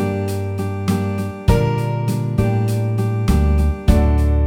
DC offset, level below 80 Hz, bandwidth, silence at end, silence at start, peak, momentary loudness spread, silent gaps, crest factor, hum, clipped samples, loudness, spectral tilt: under 0.1%; -20 dBFS; 16 kHz; 0 s; 0 s; -2 dBFS; 6 LU; none; 14 dB; none; under 0.1%; -19 LUFS; -7.5 dB/octave